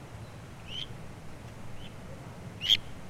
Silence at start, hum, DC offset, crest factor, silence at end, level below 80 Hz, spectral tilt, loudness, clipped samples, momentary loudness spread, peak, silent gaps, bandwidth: 0 s; none; under 0.1%; 26 dB; 0 s; -52 dBFS; -3 dB/octave; -30 LUFS; under 0.1%; 21 LU; -10 dBFS; none; 16 kHz